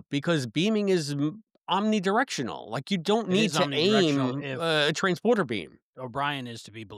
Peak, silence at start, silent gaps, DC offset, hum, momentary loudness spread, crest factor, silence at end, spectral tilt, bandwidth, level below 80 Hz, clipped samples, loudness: -10 dBFS; 0.1 s; 5.82-5.93 s; under 0.1%; none; 12 LU; 18 dB; 0 s; -5 dB/octave; 14.5 kHz; -72 dBFS; under 0.1%; -26 LUFS